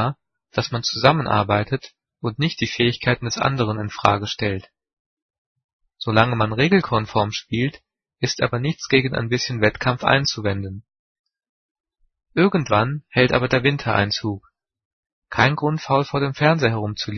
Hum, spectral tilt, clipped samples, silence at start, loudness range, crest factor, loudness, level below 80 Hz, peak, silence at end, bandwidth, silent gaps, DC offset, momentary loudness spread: none; -5.5 dB/octave; under 0.1%; 0 s; 2 LU; 22 dB; -20 LUFS; -50 dBFS; 0 dBFS; 0 s; 6.6 kHz; 4.93-5.29 s, 5.38-5.56 s, 5.64-5.79 s, 10.99-11.24 s, 11.49-11.84 s, 14.85-15.03 s, 15.12-15.22 s; under 0.1%; 10 LU